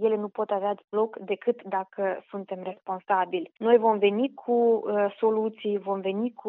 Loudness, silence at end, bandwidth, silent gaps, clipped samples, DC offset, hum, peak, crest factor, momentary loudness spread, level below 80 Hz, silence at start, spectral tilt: -27 LUFS; 0 s; 4 kHz; 0.84-0.88 s; under 0.1%; under 0.1%; none; -8 dBFS; 18 dB; 12 LU; -86 dBFS; 0 s; -4.5 dB/octave